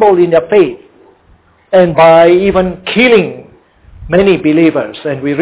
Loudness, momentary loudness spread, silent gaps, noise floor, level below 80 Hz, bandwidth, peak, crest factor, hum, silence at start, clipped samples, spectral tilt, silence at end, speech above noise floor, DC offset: -9 LUFS; 10 LU; none; -47 dBFS; -38 dBFS; 4 kHz; 0 dBFS; 10 dB; none; 0 s; 0.4%; -10 dB/octave; 0 s; 39 dB; 0.2%